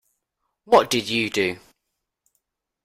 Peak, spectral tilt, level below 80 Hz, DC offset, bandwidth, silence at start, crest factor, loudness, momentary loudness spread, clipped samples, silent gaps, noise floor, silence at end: -2 dBFS; -3.5 dB/octave; -60 dBFS; under 0.1%; 16 kHz; 0.7 s; 22 dB; -21 LUFS; 8 LU; under 0.1%; none; -80 dBFS; 1.3 s